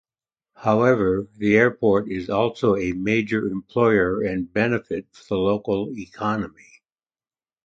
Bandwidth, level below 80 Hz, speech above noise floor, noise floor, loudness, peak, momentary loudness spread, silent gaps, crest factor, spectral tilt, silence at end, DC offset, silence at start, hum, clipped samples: 7.6 kHz; -50 dBFS; over 69 dB; under -90 dBFS; -22 LUFS; -4 dBFS; 10 LU; none; 18 dB; -7.5 dB/octave; 1.15 s; under 0.1%; 0.6 s; none; under 0.1%